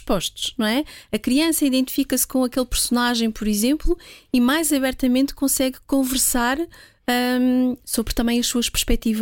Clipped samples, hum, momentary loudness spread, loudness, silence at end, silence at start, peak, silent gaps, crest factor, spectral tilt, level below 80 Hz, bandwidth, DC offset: under 0.1%; none; 7 LU; -21 LUFS; 0 s; 0.05 s; -6 dBFS; none; 16 dB; -3 dB/octave; -34 dBFS; 17 kHz; under 0.1%